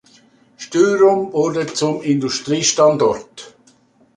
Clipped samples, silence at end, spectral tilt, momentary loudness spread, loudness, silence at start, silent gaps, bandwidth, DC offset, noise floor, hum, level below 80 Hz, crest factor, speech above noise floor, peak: under 0.1%; 0.65 s; -4 dB/octave; 15 LU; -16 LUFS; 0.6 s; none; 11 kHz; under 0.1%; -54 dBFS; none; -58 dBFS; 16 dB; 38 dB; -2 dBFS